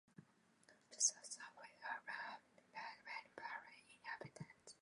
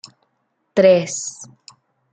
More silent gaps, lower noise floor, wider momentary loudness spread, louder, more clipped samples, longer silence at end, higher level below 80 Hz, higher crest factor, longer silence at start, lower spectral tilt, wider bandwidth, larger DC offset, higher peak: neither; about the same, -73 dBFS vs -70 dBFS; second, 20 LU vs 24 LU; second, -47 LUFS vs -17 LUFS; neither; second, 0.05 s vs 0.7 s; second, under -90 dBFS vs -68 dBFS; first, 26 dB vs 18 dB; second, 0.2 s vs 0.75 s; second, 0 dB/octave vs -4.5 dB/octave; first, 11 kHz vs 9.4 kHz; neither; second, -24 dBFS vs -2 dBFS